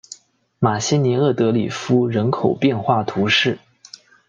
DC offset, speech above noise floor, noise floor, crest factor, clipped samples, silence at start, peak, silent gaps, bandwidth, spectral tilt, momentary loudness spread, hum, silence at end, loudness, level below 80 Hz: under 0.1%; 27 dB; -45 dBFS; 18 dB; under 0.1%; 0.6 s; -2 dBFS; none; 9.2 kHz; -5.5 dB/octave; 5 LU; none; 0.7 s; -18 LUFS; -60 dBFS